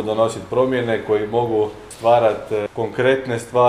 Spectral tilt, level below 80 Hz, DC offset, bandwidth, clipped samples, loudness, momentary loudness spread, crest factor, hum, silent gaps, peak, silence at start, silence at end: -6 dB/octave; -52 dBFS; under 0.1%; 14 kHz; under 0.1%; -19 LUFS; 7 LU; 16 dB; none; none; -2 dBFS; 0 s; 0 s